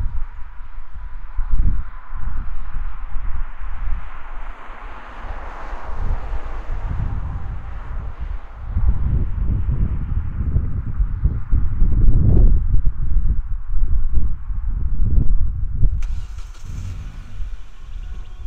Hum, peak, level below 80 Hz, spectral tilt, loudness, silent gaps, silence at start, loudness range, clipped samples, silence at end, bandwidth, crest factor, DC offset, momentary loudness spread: none; 0 dBFS; -20 dBFS; -9 dB/octave; -25 LUFS; none; 0 s; 11 LU; under 0.1%; 0 s; 3 kHz; 16 dB; under 0.1%; 15 LU